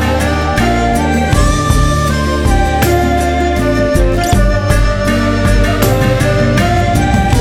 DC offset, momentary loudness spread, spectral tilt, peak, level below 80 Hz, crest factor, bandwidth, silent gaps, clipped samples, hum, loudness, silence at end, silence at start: under 0.1%; 2 LU; -5.5 dB/octave; 0 dBFS; -16 dBFS; 10 dB; 17.5 kHz; none; under 0.1%; none; -12 LUFS; 0 s; 0 s